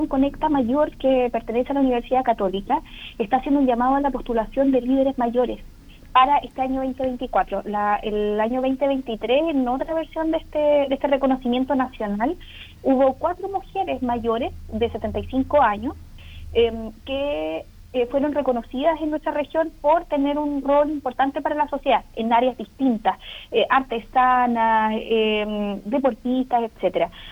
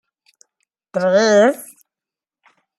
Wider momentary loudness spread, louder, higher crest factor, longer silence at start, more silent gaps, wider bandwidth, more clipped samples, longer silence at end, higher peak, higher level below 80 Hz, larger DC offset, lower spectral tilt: second, 7 LU vs 15 LU; second, -22 LUFS vs -15 LUFS; about the same, 16 dB vs 16 dB; second, 0 s vs 0.95 s; neither; second, 7.4 kHz vs 15 kHz; neither; second, 0 s vs 1.15 s; second, -6 dBFS vs -2 dBFS; first, -42 dBFS vs -70 dBFS; neither; first, -7 dB/octave vs -4.5 dB/octave